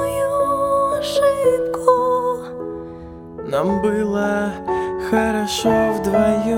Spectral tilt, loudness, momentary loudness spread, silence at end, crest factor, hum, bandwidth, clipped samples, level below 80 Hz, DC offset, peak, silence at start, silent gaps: -5 dB/octave; -19 LUFS; 13 LU; 0 s; 18 dB; none; 17 kHz; under 0.1%; -44 dBFS; under 0.1%; 0 dBFS; 0 s; none